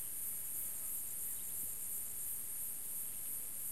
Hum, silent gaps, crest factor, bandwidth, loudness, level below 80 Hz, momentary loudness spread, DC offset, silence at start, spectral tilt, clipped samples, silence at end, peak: none; none; 14 dB; 16 kHz; -40 LUFS; -68 dBFS; 1 LU; 0.4%; 0 s; -0.5 dB/octave; under 0.1%; 0 s; -30 dBFS